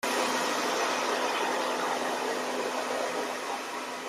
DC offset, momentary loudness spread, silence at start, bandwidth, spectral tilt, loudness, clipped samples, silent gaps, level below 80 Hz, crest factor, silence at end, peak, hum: under 0.1%; 5 LU; 0.05 s; 16 kHz; -1.5 dB/octave; -30 LUFS; under 0.1%; none; -82 dBFS; 16 dB; 0 s; -16 dBFS; none